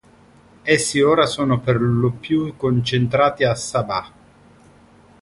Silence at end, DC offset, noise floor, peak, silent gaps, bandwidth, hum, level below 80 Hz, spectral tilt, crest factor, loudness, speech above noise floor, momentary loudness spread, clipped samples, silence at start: 1.15 s; under 0.1%; -50 dBFS; -2 dBFS; none; 11.5 kHz; none; -50 dBFS; -5 dB/octave; 18 dB; -19 LUFS; 32 dB; 7 LU; under 0.1%; 0.65 s